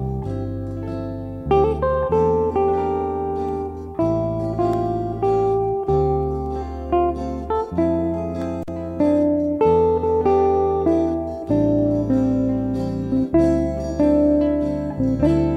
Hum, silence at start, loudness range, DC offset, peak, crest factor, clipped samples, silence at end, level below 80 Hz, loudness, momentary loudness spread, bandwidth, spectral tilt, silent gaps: none; 0 s; 3 LU; under 0.1%; -6 dBFS; 14 dB; under 0.1%; 0 s; -36 dBFS; -21 LUFS; 10 LU; 9.4 kHz; -9.5 dB/octave; none